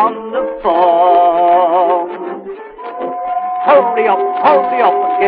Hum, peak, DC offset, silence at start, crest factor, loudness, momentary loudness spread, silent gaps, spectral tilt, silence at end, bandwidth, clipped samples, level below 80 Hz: none; 0 dBFS; under 0.1%; 0 s; 12 dB; -12 LUFS; 15 LU; none; -2.5 dB/octave; 0 s; 4.8 kHz; under 0.1%; -54 dBFS